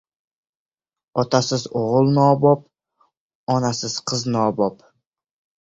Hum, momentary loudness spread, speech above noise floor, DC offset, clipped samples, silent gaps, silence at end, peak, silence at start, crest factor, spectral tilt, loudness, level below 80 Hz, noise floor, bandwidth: none; 9 LU; 55 dB; under 0.1%; under 0.1%; 3.17-3.47 s; 0.85 s; -2 dBFS; 1.15 s; 18 dB; -6 dB/octave; -20 LUFS; -58 dBFS; -74 dBFS; 8 kHz